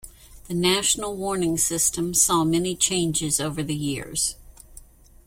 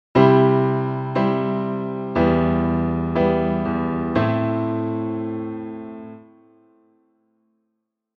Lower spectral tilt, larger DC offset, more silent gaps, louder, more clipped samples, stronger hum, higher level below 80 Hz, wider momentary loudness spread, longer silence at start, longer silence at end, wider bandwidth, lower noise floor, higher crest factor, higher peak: second, -3 dB/octave vs -10 dB/octave; neither; neither; about the same, -22 LUFS vs -21 LUFS; neither; neither; second, -48 dBFS vs -42 dBFS; second, 9 LU vs 15 LU; about the same, 0.05 s vs 0.15 s; second, 0.45 s vs 2 s; first, 16.5 kHz vs 6 kHz; second, -48 dBFS vs -77 dBFS; about the same, 20 dB vs 20 dB; about the same, -4 dBFS vs -2 dBFS